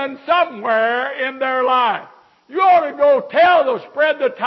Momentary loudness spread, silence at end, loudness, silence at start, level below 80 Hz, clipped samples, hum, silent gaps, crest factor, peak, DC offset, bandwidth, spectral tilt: 8 LU; 0 s; -16 LUFS; 0 s; -66 dBFS; under 0.1%; none; none; 14 dB; -4 dBFS; under 0.1%; 6 kHz; -5.5 dB/octave